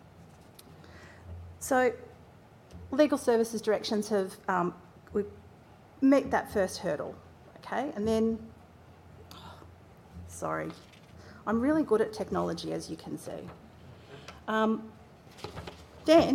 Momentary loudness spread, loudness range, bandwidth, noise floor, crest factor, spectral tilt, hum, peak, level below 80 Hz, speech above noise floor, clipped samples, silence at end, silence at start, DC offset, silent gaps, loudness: 24 LU; 6 LU; 16.5 kHz; -55 dBFS; 22 dB; -5.5 dB/octave; none; -10 dBFS; -62 dBFS; 26 dB; under 0.1%; 0 s; 0.2 s; under 0.1%; none; -30 LUFS